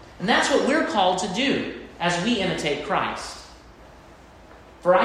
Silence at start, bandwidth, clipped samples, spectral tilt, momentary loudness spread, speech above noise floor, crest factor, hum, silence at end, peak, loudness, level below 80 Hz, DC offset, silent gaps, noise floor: 0 s; 13.5 kHz; under 0.1%; -4 dB/octave; 11 LU; 25 dB; 18 dB; none; 0 s; -6 dBFS; -23 LUFS; -52 dBFS; under 0.1%; none; -47 dBFS